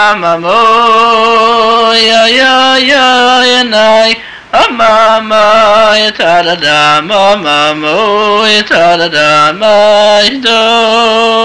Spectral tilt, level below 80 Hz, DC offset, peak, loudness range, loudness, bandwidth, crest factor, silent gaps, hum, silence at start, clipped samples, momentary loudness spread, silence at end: -2.5 dB/octave; -44 dBFS; 1%; 0 dBFS; 2 LU; -6 LUFS; 11 kHz; 6 dB; none; none; 0 s; under 0.1%; 4 LU; 0 s